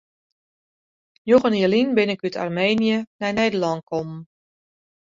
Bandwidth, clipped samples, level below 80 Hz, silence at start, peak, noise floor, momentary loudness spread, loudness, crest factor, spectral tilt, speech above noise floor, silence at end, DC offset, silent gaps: 7.6 kHz; under 0.1%; -60 dBFS; 1.25 s; -4 dBFS; under -90 dBFS; 11 LU; -21 LUFS; 20 dB; -6 dB/octave; over 70 dB; 0.8 s; under 0.1%; 3.07-3.19 s